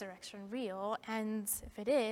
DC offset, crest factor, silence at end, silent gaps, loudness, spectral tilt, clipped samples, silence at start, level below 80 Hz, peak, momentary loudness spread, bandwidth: under 0.1%; 16 dB; 0 s; none; -39 LUFS; -3.5 dB/octave; under 0.1%; 0 s; -64 dBFS; -22 dBFS; 10 LU; 17.5 kHz